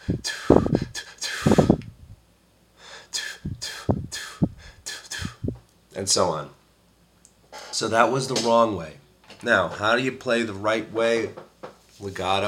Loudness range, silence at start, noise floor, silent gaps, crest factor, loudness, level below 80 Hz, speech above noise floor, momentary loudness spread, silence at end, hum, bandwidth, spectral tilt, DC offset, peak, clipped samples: 8 LU; 0 s; -59 dBFS; none; 24 dB; -24 LUFS; -46 dBFS; 37 dB; 21 LU; 0 s; none; 16.5 kHz; -4.5 dB/octave; under 0.1%; 0 dBFS; under 0.1%